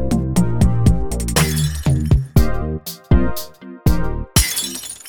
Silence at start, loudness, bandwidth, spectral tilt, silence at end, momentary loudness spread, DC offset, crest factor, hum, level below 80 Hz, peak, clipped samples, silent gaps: 0 s; -18 LUFS; 19 kHz; -5 dB/octave; 0 s; 9 LU; 3%; 16 dB; none; -22 dBFS; 0 dBFS; under 0.1%; none